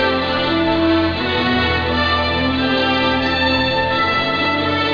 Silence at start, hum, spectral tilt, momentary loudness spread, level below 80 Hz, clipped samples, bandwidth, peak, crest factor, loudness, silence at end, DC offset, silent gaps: 0 s; none; -6 dB/octave; 2 LU; -36 dBFS; under 0.1%; 5.4 kHz; -4 dBFS; 12 dB; -16 LUFS; 0 s; under 0.1%; none